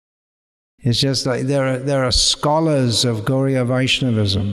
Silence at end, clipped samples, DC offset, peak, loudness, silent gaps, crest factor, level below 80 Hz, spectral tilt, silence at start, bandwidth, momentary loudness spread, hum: 0 s; under 0.1%; under 0.1%; -4 dBFS; -17 LUFS; none; 14 dB; -38 dBFS; -4.5 dB/octave; 0.85 s; 14 kHz; 5 LU; none